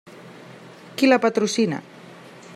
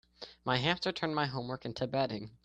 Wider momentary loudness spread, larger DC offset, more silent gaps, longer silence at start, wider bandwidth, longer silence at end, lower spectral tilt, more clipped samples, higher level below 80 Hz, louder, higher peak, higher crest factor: first, 26 LU vs 9 LU; neither; neither; second, 0.05 s vs 0.2 s; first, 15 kHz vs 9.2 kHz; about the same, 0 s vs 0.1 s; second, -4.5 dB/octave vs -6 dB/octave; neither; second, -76 dBFS vs -64 dBFS; first, -20 LUFS vs -34 LUFS; first, -2 dBFS vs -14 dBFS; about the same, 20 dB vs 22 dB